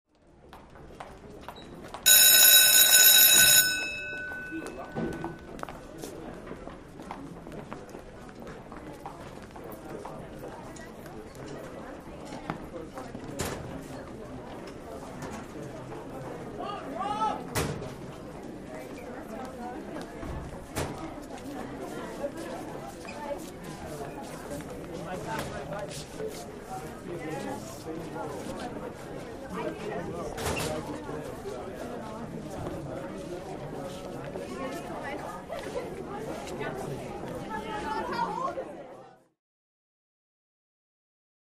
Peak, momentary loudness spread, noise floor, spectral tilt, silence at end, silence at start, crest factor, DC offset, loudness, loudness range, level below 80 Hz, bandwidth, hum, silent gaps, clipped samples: -4 dBFS; 17 LU; -54 dBFS; -1 dB/octave; 2.25 s; 0.45 s; 26 dB; under 0.1%; -24 LUFS; 24 LU; -52 dBFS; 15.5 kHz; none; none; under 0.1%